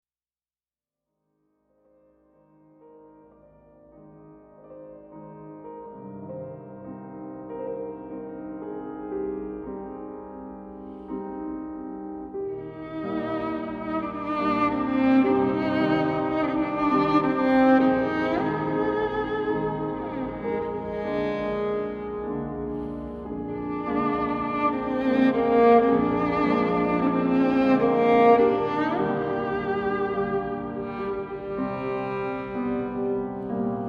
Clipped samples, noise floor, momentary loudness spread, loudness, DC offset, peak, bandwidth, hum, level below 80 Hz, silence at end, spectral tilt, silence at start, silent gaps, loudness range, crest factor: under 0.1%; under -90 dBFS; 19 LU; -25 LUFS; under 0.1%; -6 dBFS; 6.2 kHz; none; -52 dBFS; 0 s; -8.5 dB/octave; 2.85 s; none; 16 LU; 20 dB